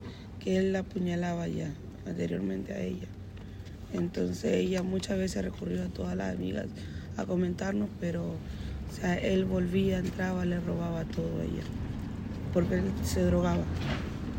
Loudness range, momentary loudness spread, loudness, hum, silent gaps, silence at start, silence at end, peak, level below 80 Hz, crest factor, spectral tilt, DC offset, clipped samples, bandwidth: 3 LU; 11 LU; -32 LUFS; none; none; 0 s; 0 s; -14 dBFS; -46 dBFS; 16 dB; -7 dB/octave; under 0.1%; under 0.1%; 16 kHz